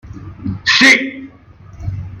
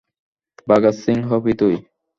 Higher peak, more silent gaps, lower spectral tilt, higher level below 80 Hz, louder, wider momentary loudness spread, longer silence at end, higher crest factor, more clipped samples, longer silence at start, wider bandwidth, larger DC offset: about the same, 0 dBFS vs -2 dBFS; neither; second, -3 dB/octave vs -8 dB/octave; first, -40 dBFS vs -54 dBFS; first, -10 LUFS vs -18 LUFS; first, 24 LU vs 9 LU; second, 0 s vs 0.35 s; about the same, 16 dB vs 18 dB; neither; second, 0.05 s vs 0.65 s; first, 15.5 kHz vs 7.6 kHz; neither